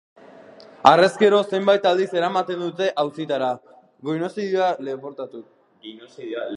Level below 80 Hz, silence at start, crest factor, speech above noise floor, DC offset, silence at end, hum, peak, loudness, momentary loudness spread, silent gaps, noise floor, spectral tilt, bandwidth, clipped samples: -72 dBFS; 0.6 s; 22 dB; 25 dB; under 0.1%; 0 s; none; 0 dBFS; -20 LUFS; 19 LU; none; -45 dBFS; -5.5 dB/octave; 11 kHz; under 0.1%